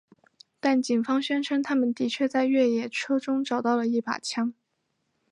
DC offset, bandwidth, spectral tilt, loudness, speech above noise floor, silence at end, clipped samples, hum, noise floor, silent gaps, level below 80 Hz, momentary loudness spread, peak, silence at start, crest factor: under 0.1%; 11 kHz; -4 dB/octave; -26 LUFS; 51 dB; 0.8 s; under 0.1%; none; -76 dBFS; none; -82 dBFS; 6 LU; -10 dBFS; 0.65 s; 16 dB